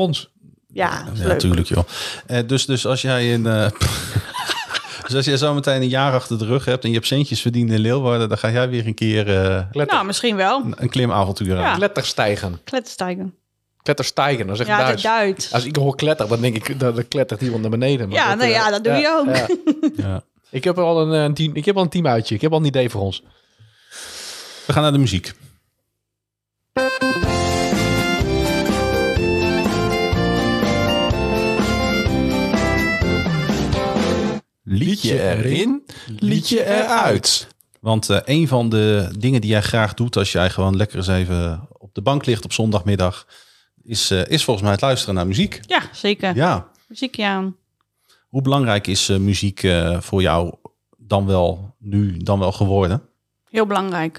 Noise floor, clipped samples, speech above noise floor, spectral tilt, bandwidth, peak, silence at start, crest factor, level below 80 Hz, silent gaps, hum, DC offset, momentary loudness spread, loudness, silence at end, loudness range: -81 dBFS; under 0.1%; 63 dB; -5 dB/octave; 15 kHz; -2 dBFS; 0 s; 18 dB; -40 dBFS; none; none; under 0.1%; 8 LU; -19 LUFS; 0 s; 3 LU